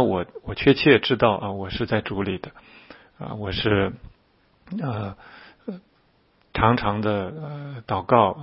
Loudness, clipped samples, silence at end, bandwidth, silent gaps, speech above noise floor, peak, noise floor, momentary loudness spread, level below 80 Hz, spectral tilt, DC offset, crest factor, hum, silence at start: -23 LUFS; under 0.1%; 0 s; 5.8 kHz; none; 39 dB; -2 dBFS; -62 dBFS; 20 LU; -46 dBFS; -10.5 dB/octave; under 0.1%; 22 dB; none; 0 s